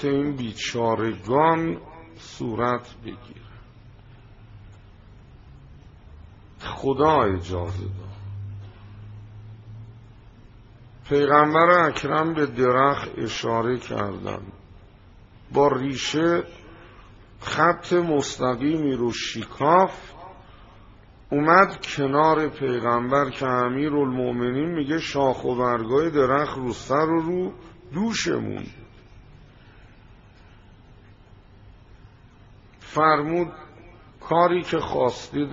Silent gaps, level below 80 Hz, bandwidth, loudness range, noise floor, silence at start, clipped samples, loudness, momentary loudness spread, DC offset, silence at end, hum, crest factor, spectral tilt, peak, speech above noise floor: none; -52 dBFS; 7.6 kHz; 11 LU; -50 dBFS; 0 s; under 0.1%; -22 LUFS; 21 LU; under 0.1%; 0 s; none; 24 dB; -4.5 dB/octave; -2 dBFS; 28 dB